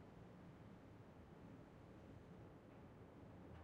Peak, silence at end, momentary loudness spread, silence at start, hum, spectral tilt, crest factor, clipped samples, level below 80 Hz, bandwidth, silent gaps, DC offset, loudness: -48 dBFS; 0 s; 1 LU; 0 s; none; -7.5 dB/octave; 14 dB; under 0.1%; -74 dBFS; 8.4 kHz; none; under 0.1%; -62 LUFS